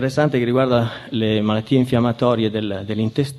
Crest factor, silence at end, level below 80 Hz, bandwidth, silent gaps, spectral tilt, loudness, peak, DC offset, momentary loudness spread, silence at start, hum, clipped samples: 16 dB; 0 s; -48 dBFS; 13 kHz; none; -7.5 dB/octave; -19 LUFS; -2 dBFS; under 0.1%; 6 LU; 0 s; none; under 0.1%